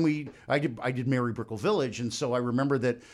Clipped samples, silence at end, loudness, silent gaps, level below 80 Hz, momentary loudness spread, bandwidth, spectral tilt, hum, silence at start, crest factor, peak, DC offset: under 0.1%; 0 s; -29 LUFS; none; -66 dBFS; 4 LU; 12 kHz; -6 dB/octave; none; 0 s; 16 dB; -12 dBFS; under 0.1%